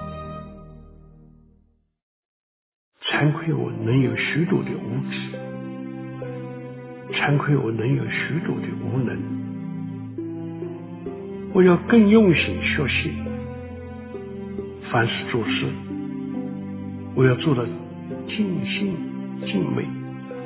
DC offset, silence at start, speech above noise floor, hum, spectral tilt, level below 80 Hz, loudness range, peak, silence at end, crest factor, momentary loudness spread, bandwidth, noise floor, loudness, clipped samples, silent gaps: under 0.1%; 0 s; 40 dB; none; -11 dB/octave; -48 dBFS; 8 LU; -4 dBFS; 0 s; 20 dB; 16 LU; 4 kHz; -61 dBFS; -23 LUFS; under 0.1%; 2.02-2.92 s